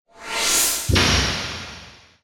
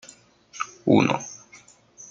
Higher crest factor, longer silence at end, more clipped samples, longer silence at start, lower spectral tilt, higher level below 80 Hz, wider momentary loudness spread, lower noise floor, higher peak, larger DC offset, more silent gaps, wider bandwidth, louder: about the same, 18 dB vs 22 dB; first, 0.3 s vs 0.05 s; neither; second, 0.2 s vs 0.55 s; second, -2 dB/octave vs -5.5 dB/octave; first, -34 dBFS vs -66 dBFS; second, 17 LU vs 25 LU; second, -43 dBFS vs -52 dBFS; about the same, -4 dBFS vs -4 dBFS; neither; neither; first, 19.5 kHz vs 9.2 kHz; first, -19 LUFS vs -23 LUFS